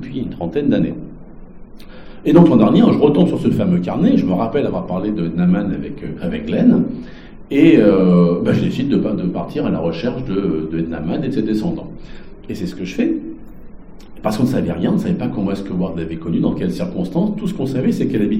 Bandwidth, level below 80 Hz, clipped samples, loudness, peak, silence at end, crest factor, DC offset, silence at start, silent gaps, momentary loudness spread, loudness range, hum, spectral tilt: 9.6 kHz; -38 dBFS; under 0.1%; -17 LUFS; 0 dBFS; 0 s; 16 dB; under 0.1%; 0 s; none; 14 LU; 8 LU; none; -8.5 dB/octave